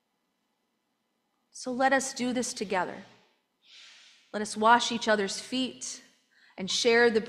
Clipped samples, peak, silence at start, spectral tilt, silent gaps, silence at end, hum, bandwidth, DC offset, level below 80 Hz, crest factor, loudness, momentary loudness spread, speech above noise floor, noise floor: under 0.1%; -8 dBFS; 1.55 s; -2.5 dB/octave; none; 0 s; none; 13.5 kHz; under 0.1%; -74 dBFS; 22 dB; -27 LUFS; 17 LU; 51 dB; -78 dBFS